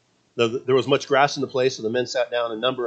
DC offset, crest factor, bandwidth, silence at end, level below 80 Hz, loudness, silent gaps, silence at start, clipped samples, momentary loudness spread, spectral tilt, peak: under 0.1%; 20 dB; 8.4 kHz; 0 s; -70 dBFS; -22 LUFS; none; 0.35 s; under 0.1%; 5 LU; -4.5 dB/octave; -2 dBFS